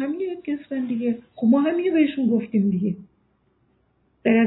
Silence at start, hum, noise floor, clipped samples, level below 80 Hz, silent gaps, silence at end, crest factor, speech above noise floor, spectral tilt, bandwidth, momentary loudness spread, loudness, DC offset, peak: 0 s; none; -65 dBFS; under 0.1%; -64 dBFS; none; 0 s; 16 dB; 44 dB; -11.5 dB/octave; 4.1 kHz; 9 LU; -23 LUFS; under 0.1%; -6 dBFS